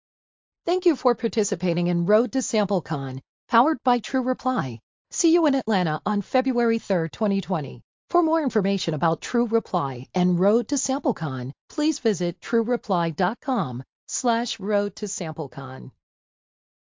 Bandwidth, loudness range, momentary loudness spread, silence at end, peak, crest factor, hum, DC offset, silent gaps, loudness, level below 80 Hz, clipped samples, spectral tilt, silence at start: 7.6 kHz; 3 LU; 11 LU; 0.95 s; -6 dBFS; 18 dB; none; under 0.1%; 3.29-3.48 s, 4.83-5.05 s, 7.84-8.08 s, 11.61-11.68 s, 13.89-14.07 s; -24 LUFS; -64 dBFS; under 0.1%; -5.5 dB/octave; 0.65 s